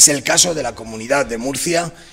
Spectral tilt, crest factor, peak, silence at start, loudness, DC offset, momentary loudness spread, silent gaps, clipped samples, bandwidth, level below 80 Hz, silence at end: -1.5 dB/octave; 16 dB; 0 dBFS; 0 s; -16 LUFS; under 0.1%; 12 LU; none; 0.1%; 16.5 kHz; -46 dBFS; 0.05 s